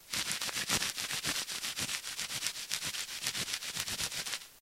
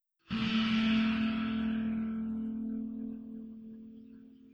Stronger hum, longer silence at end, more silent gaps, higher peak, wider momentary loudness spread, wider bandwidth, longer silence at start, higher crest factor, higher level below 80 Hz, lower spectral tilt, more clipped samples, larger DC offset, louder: neither; about the same, 0 s vs 0.05 s; neither; first, -10 dBFS vs -20 dBFS; second, 5 LU vs 20 LU; first, 16.5 kHz vs 6.6 kHz; second, 0 s vs 0.3 s; first, 28 dB vs 14 dB; about the same, -64 dBFS vs -60 dBFS; second, 0 dB/octave vs -6.5 dB/octave; neither; neither; about the same, -34 LUFS vs -33 LUFS